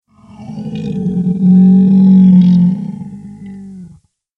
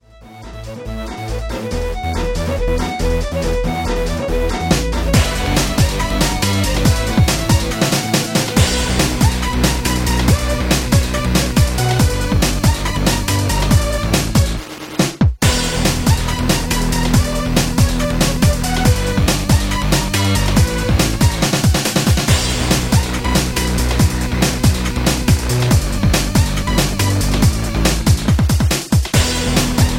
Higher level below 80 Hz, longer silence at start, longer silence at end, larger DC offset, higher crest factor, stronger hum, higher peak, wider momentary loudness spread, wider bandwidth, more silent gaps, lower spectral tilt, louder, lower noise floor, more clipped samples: second, -48 dBFS vs -20 dBFS; first, 0.4 s vs 0.2 s; first, 0.5 s vs 0 s; neither; about the same, 10 dB vs 14 dB; neither; about the same, 0 dBFS vs 0 dBFS; first, 24 LU vs 5 LU; second, 4 kHz vs 17 kHz; neither; first, -11 dB/octave vs -4.5 dB/octave; first, -9 LUFS vs -16 LUFS; first, -44 dBFS vs -36 dBFS; neither